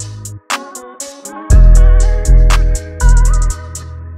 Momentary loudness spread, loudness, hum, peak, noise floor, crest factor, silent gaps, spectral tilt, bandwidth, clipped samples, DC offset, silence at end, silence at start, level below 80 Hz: 18 LU; -13 LUFS; none; 0 dBFS; -29 dBFS; 10 dB; none; -5 dB/octave; 11.5 kHz; under 0.1%; under 0.1%; 0 s; 0 s; -10 dBFS